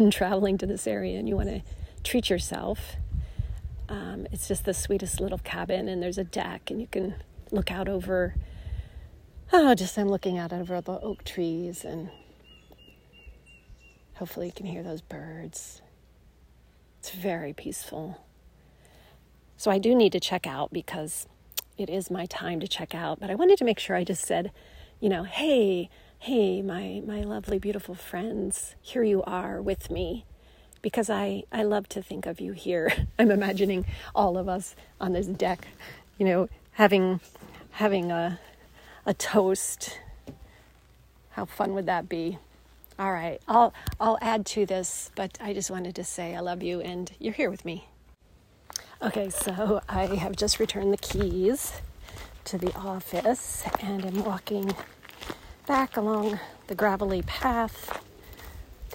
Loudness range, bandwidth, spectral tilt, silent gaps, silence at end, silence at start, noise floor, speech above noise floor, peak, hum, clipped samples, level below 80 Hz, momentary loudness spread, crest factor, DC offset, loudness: 11 LU; 16 kHz; -4.5 dB/octave; none; 0 s; 0 s; -58 dBFS; 31 dB; -6 dBFS; none; under 0.1%; -44 dBFS; 16 LU; 24 dB; under 0.1%; -28 LUFS